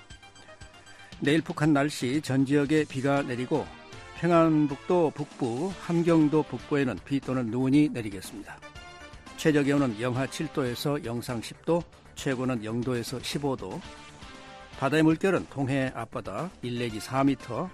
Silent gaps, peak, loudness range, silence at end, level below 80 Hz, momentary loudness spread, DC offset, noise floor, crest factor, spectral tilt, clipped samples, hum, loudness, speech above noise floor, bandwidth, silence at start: none; -10 dBFS; 5 LU; 0 s; -56 dBFS; 20 LU; under 0.1%; -49 dBFS; 16 dB; -6.5 dB/octave; under 0.1%; none; -27 LUFS; 22 dB; 14 kHz; 0 s